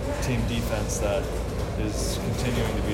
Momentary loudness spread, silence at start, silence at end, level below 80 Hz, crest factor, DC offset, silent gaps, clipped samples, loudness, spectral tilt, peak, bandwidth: 3 LU; 0 s; 0 s; -32 dBFS; 12 dB; under 0.1%; none; under 0.1%; -27 LUFS; -5 dB/octave; -14 dBFS; 16 kHz